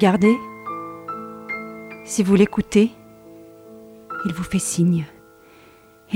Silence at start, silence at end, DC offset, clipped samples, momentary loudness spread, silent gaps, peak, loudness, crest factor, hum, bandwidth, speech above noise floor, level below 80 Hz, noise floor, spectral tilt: 0 s; 0 s; under 0.1%; under 0.1%; 16 LU; none; -2 dBFS; -21 LUFS; 20 dB; none; 15.5 kHz; 32 dB; -52 dBFS; -50 dBFS; -6 dB/octave